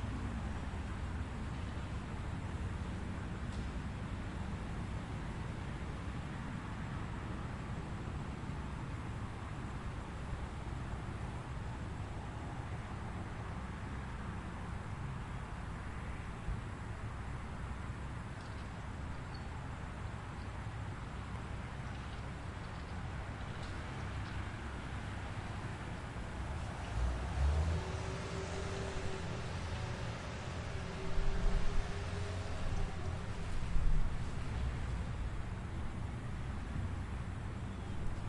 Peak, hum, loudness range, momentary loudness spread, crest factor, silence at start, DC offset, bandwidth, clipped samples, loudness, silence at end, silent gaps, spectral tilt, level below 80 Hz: -20 dBFS; none; 5 LU; 5 LU; 20 dB; 0 s; under 0.1%; 11 kHz; under 0.1%; -43 LUFS; 0 s; none; -6 dB/octave; -44 dBFS